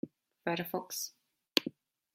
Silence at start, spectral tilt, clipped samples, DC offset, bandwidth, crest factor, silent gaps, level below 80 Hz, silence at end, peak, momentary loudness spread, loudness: 0.05 s; -3 dB/octave; under 0.1%; under 0.1%; 16.5 kHz; 34 dB; none; -84 dBFS; 0.45 s; -6 dBFS; 12 LU; -36 LUFS